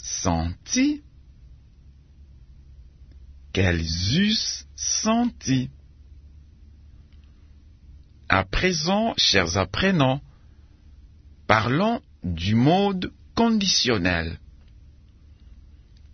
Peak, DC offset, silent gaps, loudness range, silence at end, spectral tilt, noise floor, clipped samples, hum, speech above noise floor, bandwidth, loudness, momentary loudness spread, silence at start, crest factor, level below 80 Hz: 0 dBFS; under 0.1%; none; 7 LU; 0.55 s; -4 dB/octave; -50 dBFS; under 0.1%; none; 28 dB; 6.6 kHz; -22 LUFS; 11 LU; 0 s; 24 dB; -44 dBFS